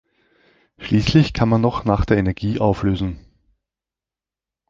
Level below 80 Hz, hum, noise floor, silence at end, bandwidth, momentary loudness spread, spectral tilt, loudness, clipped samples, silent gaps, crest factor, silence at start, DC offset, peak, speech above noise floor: -34 dBFS; none; -89 dBFS; 1.5 s; 7.6 kHz; 10 LU; -7.5 dB/octave; -19 LUFS; under 0.1%; none; 18 dB; 0.8 s; under 0.1%; -2 dBFS; 72 dB